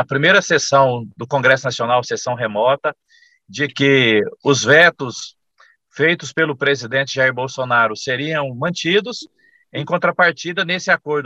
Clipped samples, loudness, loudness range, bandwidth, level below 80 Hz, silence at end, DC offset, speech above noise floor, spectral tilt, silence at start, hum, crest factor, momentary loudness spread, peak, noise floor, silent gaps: under 0.1%; -16 LUFS; 3 LU; 8.6 kHz; -64 dBFS; 0 s; under 0.1%; 38 dB; -4 dB/octave; 0 s; none; 18 dB; 13 LU; 0 dBFS; -55 dBFS; none